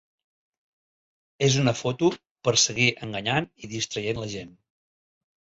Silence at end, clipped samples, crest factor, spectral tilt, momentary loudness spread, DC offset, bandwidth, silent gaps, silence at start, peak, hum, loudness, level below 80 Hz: 1.1 s; under 0.1%; 20 dB; -3.5 dB/octave; 11 LU; under 0.1%; 8 kHz; 2.31-2.35 s; 1.4 s; -8 dBFS; none; -24 LUFS; -58 dBFS